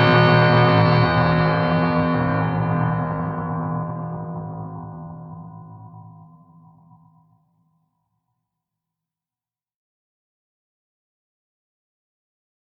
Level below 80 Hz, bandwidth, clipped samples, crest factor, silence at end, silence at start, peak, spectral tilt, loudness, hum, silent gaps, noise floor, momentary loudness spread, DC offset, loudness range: -50 dBFS; 5.6 kHz; under 0.1%; 20 dB; 6.55 s; 0 s; -4 dBFS; -9 dB/octave; -19 LUFS; none; none; under -90 dBFS; 22 LU; under 0.1%; 22 LU